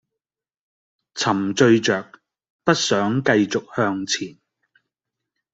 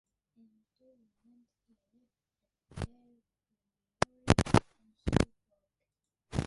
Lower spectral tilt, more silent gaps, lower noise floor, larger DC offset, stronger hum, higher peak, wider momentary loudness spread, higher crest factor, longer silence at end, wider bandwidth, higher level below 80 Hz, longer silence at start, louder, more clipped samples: second, -4.5 dB/octave vs -6 dB/octave; first, 2.50-2.59 s vs none; about the same, -88 dBFS vs -89 dBFS; neither; neither; about the same, -2 dBFS vs -4 dBFS; second, 10 LU vs 17 LU; second, 20 dB vs 32 dB; first, 1.25 s vs 0 s; second, 8.2 kHz vs 11.5 kHz; second, -62 dBFS vs -46 dBFS; second, 1.15 s vs 2.75 s; first, -20 LUFS vs -32 LUFS; neither